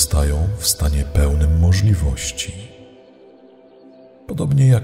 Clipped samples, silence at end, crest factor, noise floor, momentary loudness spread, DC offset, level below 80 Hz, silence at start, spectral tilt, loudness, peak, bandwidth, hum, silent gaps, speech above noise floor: under 0.1%; 0 s; 16 dB; -46 dBFS; 13 LU; under 0.1%; -22 dBFS; 0 s; -5 dB/octave; -18 LUFS; -2 dBFS; 16 kHz; none; none; 30 dB